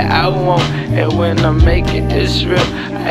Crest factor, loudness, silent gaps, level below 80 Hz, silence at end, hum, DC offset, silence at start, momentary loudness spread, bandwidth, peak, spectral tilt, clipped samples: 12 dB; -14 LUFS; none; -20 dBFS; 0 s; none; under 0.1%; 0 s; 4 LU; 13 kHz; 0 dBFS; -6.5 dB/octave; under 0.1%